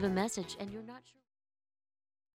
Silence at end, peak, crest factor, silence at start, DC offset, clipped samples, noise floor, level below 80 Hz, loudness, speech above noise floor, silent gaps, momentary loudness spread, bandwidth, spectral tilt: 1.35 s; -18 dBFS; 22 dB; 0 s; under 0.1%; under 0.1%; under -90 dBFS; -66 dBFS; -38 LUFS; over 53 dB; none; 18 LU; 15.5 kHz; -5 dB/octave